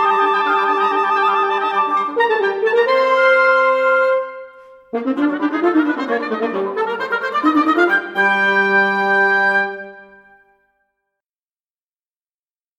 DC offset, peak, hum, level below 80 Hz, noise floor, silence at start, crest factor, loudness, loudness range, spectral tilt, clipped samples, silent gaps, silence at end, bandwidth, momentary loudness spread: under 0.1%; -2 dBFS; none; -70 dBFS; under -90 dBFS; 0 s; 14 dB; -16 LUFS; 5 LU; -5 dB/octave; under 0.1%; none; 2.75 s; 13 kHz; 8 LU